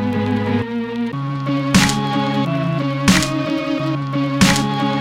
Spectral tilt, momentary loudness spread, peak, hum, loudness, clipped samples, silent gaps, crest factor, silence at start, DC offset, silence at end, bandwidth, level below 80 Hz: -5 dB/octave; 8 LU; -2 dBFS; none; -18 LUFS; under 0.1%; none; 16 dB; 0 s; under 0.1%; 0 s; 16.5 kHz; -40 dBFS